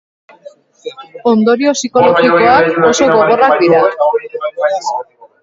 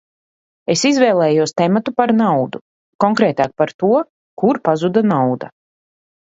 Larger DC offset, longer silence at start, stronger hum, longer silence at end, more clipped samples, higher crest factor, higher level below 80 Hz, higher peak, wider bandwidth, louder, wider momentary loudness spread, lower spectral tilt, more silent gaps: neither; first, 0.85 s vs 0.7 s; neither; second, 0.4 s vs 0.8 s; neither; about the same, 12 dB vs 16 dB; first, -52 dBFS vs -62 dBFS; about the same, 0 dBFS vs 0 dBFS; about the same, 7.8 kHz vs 8 kHz; first, -11 LUFS vs -16 LUFS; about the same, 14 LU vs 12 LU; about the same, -4.5 dB/octave vs -5.5 dB/octave; second, none vs 2.61-2.99 s, 3.74-3.79 s, 4.09-4.37 s